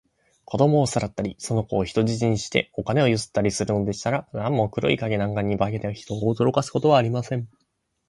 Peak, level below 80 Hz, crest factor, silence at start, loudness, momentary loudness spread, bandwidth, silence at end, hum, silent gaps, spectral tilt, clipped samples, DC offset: -4 dBFS; -50 dBFS; 18 dB; 0.5 s; -23 LUFS; 9 LU; 11.5 kHz; 0.65 s; none; none; -6 dB/octave; under 0.1%; under 0.1%